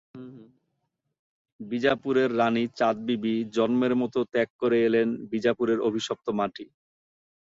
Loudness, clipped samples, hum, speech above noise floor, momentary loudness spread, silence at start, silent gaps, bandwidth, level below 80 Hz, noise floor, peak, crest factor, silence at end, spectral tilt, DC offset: -26 LUFS; under 0.1%; none; 54 dB; 10 LU; 0.15 s; 1.19-1.45 s, 1.52-1.59 s, 4.50-4.59 s; 7.8 kHz; -68 dBFS; -79 dBFS; -8 dBFS; 18 dB; 0.75 s; -6 dB/octave; under 0.1%